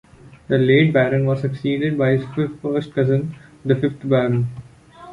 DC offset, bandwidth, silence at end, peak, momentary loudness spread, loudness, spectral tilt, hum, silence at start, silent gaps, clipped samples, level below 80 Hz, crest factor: under 0.1%; 5.4 kHz; 0 s; -2 dBFS; 10 LU; -19 LUFS; -9 dB/octave; none; 0.25 s; none; under 0.1%; -52 dBFS; 16 dB